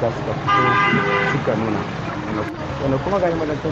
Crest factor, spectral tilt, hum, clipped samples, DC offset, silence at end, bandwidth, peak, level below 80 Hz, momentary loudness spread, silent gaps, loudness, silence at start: 14 dB; -6.5 dB/octave; none; under 0.1%; under 0.1%; 0 s; 8 kHz; -6 dBFS; -42 dBFS; 9 LU; none; -20 LUFS; 0 s